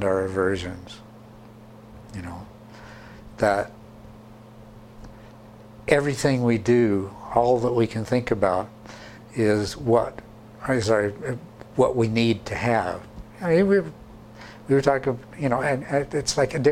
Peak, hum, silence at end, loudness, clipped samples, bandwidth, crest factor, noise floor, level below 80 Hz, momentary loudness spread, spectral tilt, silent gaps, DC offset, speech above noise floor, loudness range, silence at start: -4 dBFS; none; 0 s; -23 LUFS; under 0.1%; 15.5 kHz; 22 dB; -45 dBFS; -50 dBFS; 23 LU; -6 dB/octave; none; under 0.1%; 23 dB; 9 LU; 0 s